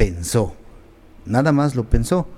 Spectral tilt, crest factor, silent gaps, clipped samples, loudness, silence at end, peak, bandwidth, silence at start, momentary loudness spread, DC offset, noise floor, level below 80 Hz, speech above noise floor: -6.5 dB/octave; 20 dB; none; under 0.1%; -20 LUFS; 0 s; 0 dBFS; 16 kHz; 0 s; 8 LU; under 0.1%; -44 dBFS; -28 dBFS; 26 dB